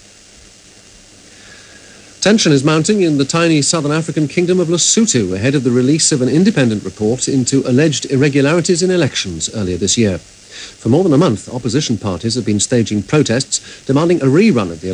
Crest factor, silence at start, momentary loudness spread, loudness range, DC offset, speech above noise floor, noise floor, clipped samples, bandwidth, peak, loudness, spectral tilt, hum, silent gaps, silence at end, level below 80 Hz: 14 dB; 1.5 s; 7 LU; 3 LU; under 0.1%; 29 dB; -42 dBFS; under 0.1%; 11 kHz; 0 dBFS; -14 LUFS; -4.5 dB/octave; none; none; 0 s; -48 dBFS